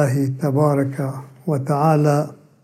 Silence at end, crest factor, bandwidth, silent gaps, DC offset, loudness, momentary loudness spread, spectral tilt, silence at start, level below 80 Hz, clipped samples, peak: 0.3 s; 16 dB; 14.5 kHz; none; under 0.1%; -19 LUFS; 11 LU; -8 dB/octave; 0 s; -68 dBFS; under 0.1%; -4 dBFS